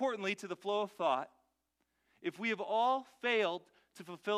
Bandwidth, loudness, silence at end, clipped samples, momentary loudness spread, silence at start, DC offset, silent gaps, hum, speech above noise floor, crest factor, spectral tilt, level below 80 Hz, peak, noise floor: 14 kHz; -36 LUFS; 0 s; under 0.1%; 13 LU; 0 s; under 0.1%; none; none; 47 dB; 18 dB; -4 dB/octave; -90 dBFS; -18 dBFS; -83 dBFS